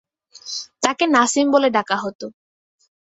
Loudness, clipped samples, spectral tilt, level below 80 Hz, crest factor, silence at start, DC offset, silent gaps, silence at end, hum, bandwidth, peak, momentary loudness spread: -19 LUFS; under 0.1%; -2.5 dB/octave; -66 dBFS; 20 dB; 0.45 s; under 0.1%; 2.15-2.19 s; 0.8 s; none; 8.2 kHz; -2 dBFS; 19 LU